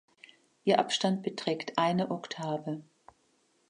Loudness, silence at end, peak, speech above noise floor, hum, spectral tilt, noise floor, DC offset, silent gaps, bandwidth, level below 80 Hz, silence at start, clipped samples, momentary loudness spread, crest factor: -31 LUFS; 0.85 s; -10 dBFS; 40 dB; none; -5 dB/octave; -71 dBFS; under 0.1%; none; 10.5 kHz; -78 dBFS; 0.65 s; under 0.1%; 9 LU; 22 dB